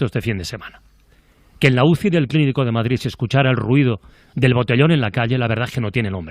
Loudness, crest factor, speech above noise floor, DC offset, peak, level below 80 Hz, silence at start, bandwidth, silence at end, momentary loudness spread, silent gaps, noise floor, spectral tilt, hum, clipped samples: -18 LUFS; 18 dB; 35 dB; under 0.1%; 0 dBFS; -46 dBFS; 0 s; 13.5 kHz; 0 s; 9 LU; none; -53 dBFS; -7 dB/octave; none; under 0.1%